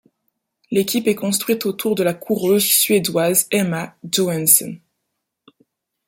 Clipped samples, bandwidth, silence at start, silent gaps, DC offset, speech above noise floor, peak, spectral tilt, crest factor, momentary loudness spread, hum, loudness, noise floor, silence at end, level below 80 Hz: under 0.1%; 17 kHz; 0.7 s; none; under 0.1%; 59 dB; 0 dBFS; -3.5 dB/octave; 20 dB; 9 LU; none; -17 LUFS; -77 dBFS; 1.3 s; -64 dBFS